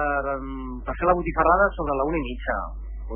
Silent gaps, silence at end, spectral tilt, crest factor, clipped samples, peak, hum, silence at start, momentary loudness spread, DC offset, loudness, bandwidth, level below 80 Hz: none; 0 s; -11 dB/octave; 18 dB; under 0.1%; -6 dBFS; none; 0 s; 14 LU; under 0.1%; -24 LUFS; 3.5 kHz; -34 dBFS